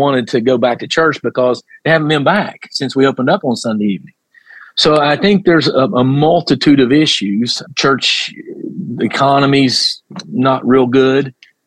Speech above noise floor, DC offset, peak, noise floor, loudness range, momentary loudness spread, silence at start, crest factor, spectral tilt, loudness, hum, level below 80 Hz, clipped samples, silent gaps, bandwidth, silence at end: 28 dB; under 0.1%; 0 dBFS; -41 dBFS; 3 LU; 10 LU; 0 s; 12 dB; -5 dB/octave; -13 LUFS; none; -52 dBFS; under 0.1%; none; 11.5 kHz; 0.35 s